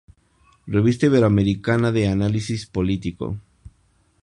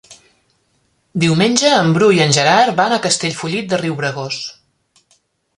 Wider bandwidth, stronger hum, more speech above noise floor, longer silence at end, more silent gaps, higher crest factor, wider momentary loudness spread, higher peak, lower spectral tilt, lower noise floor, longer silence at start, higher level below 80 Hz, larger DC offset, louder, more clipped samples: about the same, 10.5 kHz vs 11.5 kHz; neither; second, 42 dB vs 48 dB; second, 0.55 s vs 1.05 s; neither; about the same, 18 dB vs 16 dB; about the same, 12 LU vs 12 LU; second, -4 dBFS vs 0 dBFS; first, -7.5 dB/octave vs -4 dB/octave; about the same, -61 dBFS vs -62 dBFS; first, 0.65 s vs 0.1 s; first, -42 dBFS vs -58 dBFS; neither; second, -21 LUFS vs -14 LUFS; neither